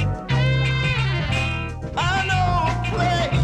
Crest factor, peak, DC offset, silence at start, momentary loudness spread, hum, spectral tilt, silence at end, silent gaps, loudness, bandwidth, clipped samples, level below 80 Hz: 12 dB; -8 dBFS; under 0.1%; 0 s; 5 LU; none; -5.5 dB/octave; 0 s; none; -21 LUFS; 9.6 kHz; under 0.1%; -32 dBFS